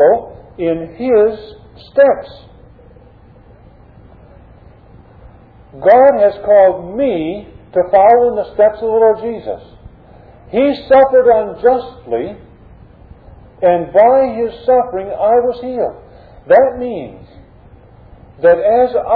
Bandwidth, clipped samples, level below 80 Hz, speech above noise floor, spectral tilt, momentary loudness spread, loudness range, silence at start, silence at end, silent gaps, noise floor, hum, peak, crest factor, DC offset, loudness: 4.8 kHz; under 0.1%; -44 dBFS; 30 dB; -9.5 dB/octave; 14 LU; 6 LU; 0 s; 0 s; none; -42 dBFS; none; 0 dBFS; 14 dB; under 0.1%; -13 LUFS